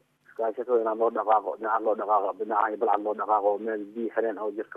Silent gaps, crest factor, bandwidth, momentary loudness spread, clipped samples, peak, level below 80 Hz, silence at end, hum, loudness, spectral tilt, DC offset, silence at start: none; 18 dB; 3.8 kHz; 7 LU; under 0.1%; -10 dBFS; -82 dBFS; 0 s; none; -27 LUFS; -7.5 dB/octave; under 0.1%; 0.4 s